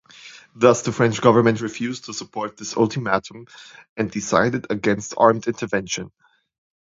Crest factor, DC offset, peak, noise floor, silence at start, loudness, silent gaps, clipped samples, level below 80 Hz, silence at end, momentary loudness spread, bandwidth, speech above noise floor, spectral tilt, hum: 22 dB; under 0.1%; 0 dBFS; -45 dBFS; 0.25 s; -21 LUFS; 3.89-3.96 s; under 0.1%; -56 dBFS; 0.75 s; 16 LU; 7.8 kHz; 24 dB; -5 dB/octave; none